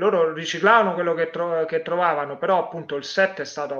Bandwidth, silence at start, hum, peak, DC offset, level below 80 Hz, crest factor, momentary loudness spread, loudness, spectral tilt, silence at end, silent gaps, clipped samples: 7.4 kHz; 0 s; none; -4 dBFS; under 0.1%; -74 dBFS; 18 dB; 9 LU; -22 LUFS; -4.5 dB/octave; 0 s; none; under 0.1%